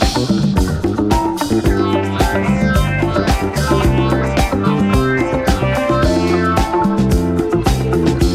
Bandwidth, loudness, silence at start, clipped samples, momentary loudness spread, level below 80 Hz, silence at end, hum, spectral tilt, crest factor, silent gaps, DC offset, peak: 16 kHz; -15 LUFS; 0 s; under 0.1%; 2 LU; -22 dBFS; 0 s; none; -6 dB/octave; 14 dB; none; under 0.1%; 0 dBFS